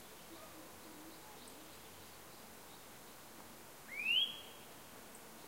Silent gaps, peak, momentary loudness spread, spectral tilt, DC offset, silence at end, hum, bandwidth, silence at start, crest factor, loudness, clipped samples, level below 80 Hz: none; -24 dBFS; 21 LU; -1 dB/octave; under 0.1%; 0 s; none; 16 kHz; 0 s; 22 dB; -40 LUFS; under 0.1%; -74 dBFS